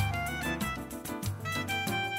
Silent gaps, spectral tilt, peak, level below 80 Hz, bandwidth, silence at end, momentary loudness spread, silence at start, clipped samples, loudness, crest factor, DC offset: none; -4 dB/octave; -16 dBFS; -48 dBFS; 16 kHz; 0 s; 6 LU; 0 s; under 0.1%; -33 LUFS; 16 dB; under 0.1%